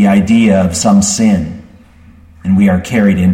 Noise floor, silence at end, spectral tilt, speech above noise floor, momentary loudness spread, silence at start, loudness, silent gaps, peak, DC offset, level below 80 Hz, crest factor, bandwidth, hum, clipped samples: -40 dBFS; 0 s; -5.5 dB/octave; 30 dB; 12 LU; 0 s; -10 LUFS; none; 0 dBFS; under 0.1%; -36 dBFS; 10 dB; 13.5 kHz; none; under 0.1%